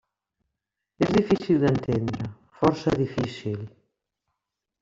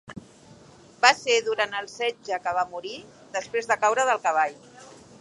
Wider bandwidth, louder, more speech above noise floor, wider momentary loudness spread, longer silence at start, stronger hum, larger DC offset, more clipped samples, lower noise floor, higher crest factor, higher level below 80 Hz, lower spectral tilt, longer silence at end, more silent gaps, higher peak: second, 7.8 kHz vs 11.5 kHz; about the same, -25 LUFS vs -24 LUFS; first, 60 dB vs 26 dB; second, 13 LU vs 17 LU; first, 1 s vs 0.1 s; neither; neither; neither; first, -84 dBFS vs -51 dBFS; about the same, 20 dB vs 24 dB; first, -54 dBFS vs -68 dBFS; first, -7.5 dB/octave vs -1 dB/octave; first, 1.15 s vs 0.35 s; neither; about the same, -6 dBFS vs -4 dBFS